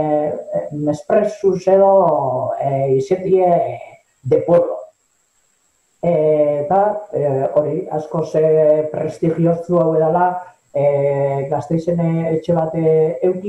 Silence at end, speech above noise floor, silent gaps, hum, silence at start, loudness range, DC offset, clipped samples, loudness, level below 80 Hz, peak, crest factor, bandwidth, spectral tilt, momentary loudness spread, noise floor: 0 s; 47 dB; none; none; 0 s; 3 LU; under 0.1%; under 0.1%; -17 LUFS; -58 dBFS; -2 dBFS; 14 dB; 8.6 kHz; -9 dB/octave; 9 LU; -62 dBFS